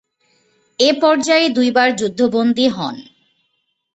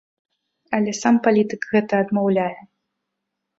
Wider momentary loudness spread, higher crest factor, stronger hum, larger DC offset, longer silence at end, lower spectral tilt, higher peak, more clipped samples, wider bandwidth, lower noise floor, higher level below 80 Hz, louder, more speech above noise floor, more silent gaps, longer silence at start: first, 13 LU vs 7 LU; about the same, 16 dB vs 18 dB; neither; neither; about the same, 0.95 s vs 1 s; second, -3.5 dB/octave vs -6 dB/octave; about the same, -2 dBFS vs -2 dBFS; neither; about the same, 8.2 kHz vs 8 kHz; second, -69 dBFS vs -80 dBFS; first, -60 dBFS vs -66 dBFS; first, -15 LUFS vs -20 LUFS; second, 54 dB vs 60 dB; neither; about the same, 0.8 s vs 0.7 s